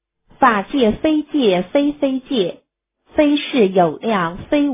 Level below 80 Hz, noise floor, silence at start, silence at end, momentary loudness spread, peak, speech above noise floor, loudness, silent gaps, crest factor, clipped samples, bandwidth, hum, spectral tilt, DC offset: -48 dBFS; -58 dBFS; 0.4 s; 0 s; 6 LU; 0 dBFS; 42 dB; -17 LUFS; none; 16 dB; under 0.1%; 3.8 kHz; none; -10 dB/octave; under 0.1%